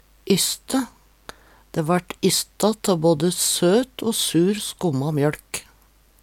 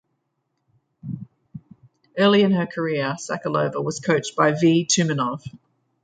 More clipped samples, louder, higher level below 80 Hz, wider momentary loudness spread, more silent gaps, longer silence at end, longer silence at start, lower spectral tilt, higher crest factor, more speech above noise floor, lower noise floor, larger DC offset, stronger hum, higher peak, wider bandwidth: neither; about the same, -21 LUFS vs -21 LUFS; first, -54 dBFS vs -64 dBFS; second, 9 LU vs 18 LU; neither; first, 0.6 s vs 0.45 s; second, 0.25 s vs 1.05 s; about the same, -4 dB/octave vs -4.5 dB/octave; about the same, 18 dB vs 20 dB; second, 35 dB vs 54 dB; second, -56 dBFS vs -74 dBFS; neither; neither; about the same, -4 dBFS vs -2 dBFS; first, 18 kHz vs 9.4 kHz